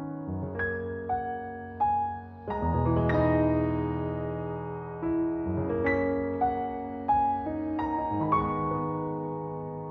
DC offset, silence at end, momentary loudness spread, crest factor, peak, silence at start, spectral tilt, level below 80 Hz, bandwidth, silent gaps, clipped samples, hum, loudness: under 0.1%; 0 s; 10 LU; 16 dB; -14 dBFS; 0 s; -10.5 dB/octave; -46 dBFS; 5 kHz; none; under 0.1%; none; -30 LUFS